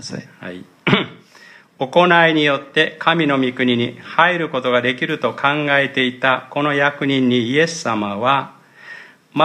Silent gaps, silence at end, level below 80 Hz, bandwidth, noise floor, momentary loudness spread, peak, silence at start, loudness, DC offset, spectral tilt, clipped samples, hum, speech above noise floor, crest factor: none; 0 s; -62 dBFS; 10.5 kHz; -45 dBFS; 17 LU; 0 dBFS; 0 s; -17 LUFS; under 0.1%; -5 dB/octave; under 0.1%; none; 28 dB; 18 dB